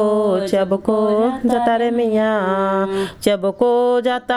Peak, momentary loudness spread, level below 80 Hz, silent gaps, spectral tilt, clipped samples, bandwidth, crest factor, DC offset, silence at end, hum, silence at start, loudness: -2 dBFS; 3 LU; -52 dBFS; none; -6 dB/octave; under 0.1%; 14 kHz; 16 dB; under 0.1%; 0 s; none; 0 s; -17 LUFS